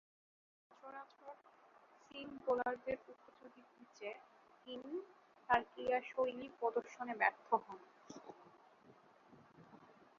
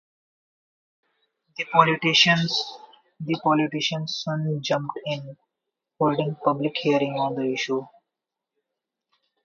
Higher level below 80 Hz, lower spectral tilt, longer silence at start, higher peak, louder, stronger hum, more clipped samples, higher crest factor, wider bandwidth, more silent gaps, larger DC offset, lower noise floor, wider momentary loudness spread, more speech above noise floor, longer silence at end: second, -78 dBFS vs -70 dBFS; second, -1.5 dB/octave vs -4.5 dB/octave; second, 0.85 s vs 1.6 s; second, -18 dBFS vs -2 dBFS; second, -41 LUFS vs -23 LUFS; neither; neither; about the same, 26 dB vs 24 dB; about the same, 7.2 kHz vs 7.4 kHz; neither; neither; second, -67 dBFS vs -86 dBFS; first, 25 LU vs 14 LU; second, 25 dB vs 62 dB; second, 0.35 s vs 1.55 s